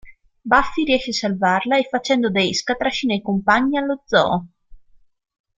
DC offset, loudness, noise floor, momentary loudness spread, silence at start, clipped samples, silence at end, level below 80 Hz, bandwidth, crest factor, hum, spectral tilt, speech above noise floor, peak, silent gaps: under 0.1%; -19 LUFS; -51 dBFS; 5 LU; 0.05 s; under 0.1%; 0.8 s; -46 dBFS; 9.2 kHz; 18 dB; none; -4.5 dB/octave; 32 dB; -2 dBFS; none